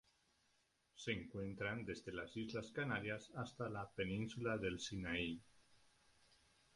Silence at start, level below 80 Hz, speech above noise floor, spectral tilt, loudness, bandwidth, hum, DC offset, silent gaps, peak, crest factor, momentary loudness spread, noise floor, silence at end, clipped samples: 0.95 s; -68 dBFS; 35 dB; -5 dB/octave; -46 LUFS; 11.5 kHz; none; under 0.1%; none; -26 dBFS; 22 dB; 6 LU; -80 dBFS; 1 s; under 0.1%